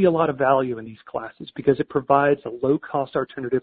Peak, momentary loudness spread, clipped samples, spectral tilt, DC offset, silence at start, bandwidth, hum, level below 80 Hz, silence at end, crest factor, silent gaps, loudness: -2 dBFS; 14 LU; under 0.1%; -11.5 dB/octave; under 0.1%; 0 s; 4.7 kHz; none; -58 dBFS; 0 s; 18 dB; none; -22 LUFS